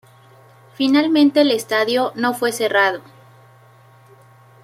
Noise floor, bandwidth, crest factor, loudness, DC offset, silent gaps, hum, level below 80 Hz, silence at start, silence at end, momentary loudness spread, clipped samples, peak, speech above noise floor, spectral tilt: -48 dBFS; 15.5 kHz; 16 dB; -17 LUFS; under 0.1%; none; none; -70 dBFS; 0.8 s; 1.65 s; 6 LU; under 0.1%; -2 dBFS; 32 dB; -3.5 dB/octave